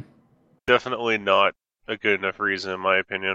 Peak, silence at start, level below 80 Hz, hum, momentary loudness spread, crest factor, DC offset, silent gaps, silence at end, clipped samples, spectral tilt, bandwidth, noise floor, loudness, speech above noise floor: -2 dBFS; 0 s; -60 dBFS; none; 9 LU; 22 dB; under 0.1%; none; 0 s; under 0.1%; -4.5 dB/octave; 8 kHz; -61 dBFS; -23 LUFS; 38 dB